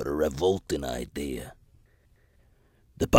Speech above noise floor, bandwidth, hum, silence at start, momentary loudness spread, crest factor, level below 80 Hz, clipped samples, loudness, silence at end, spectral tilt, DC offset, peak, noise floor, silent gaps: 33 dB; 16.5 kHz; none; 0 s; 11 LU; 28 dB; -46 dBFS; under 0.1%; -30 LUFS; 0 s; -5.5 dB/octave; under 0.1%; 0 dBFS; -62 dBFS; none